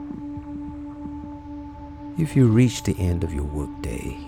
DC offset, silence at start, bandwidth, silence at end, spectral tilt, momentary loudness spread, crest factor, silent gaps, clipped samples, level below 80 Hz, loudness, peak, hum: under 0.1%; 0 s; 15.5 kHz; 0 s; -7 dB/octave; 19 LU; 18 dB; none; under 0.1%; -38 dBFS; -24 LUFS; -6 dBFS; none